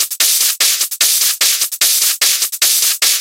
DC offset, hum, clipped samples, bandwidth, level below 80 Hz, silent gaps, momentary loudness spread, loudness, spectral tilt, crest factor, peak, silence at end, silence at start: under 0.1%; none; under 0.1%; 17.5 kHz; -68 dBFS; none; 2 LU; -11 LUFS; 5 dB/octave; 14 dB; 0 dBFS; 0 s; 0 s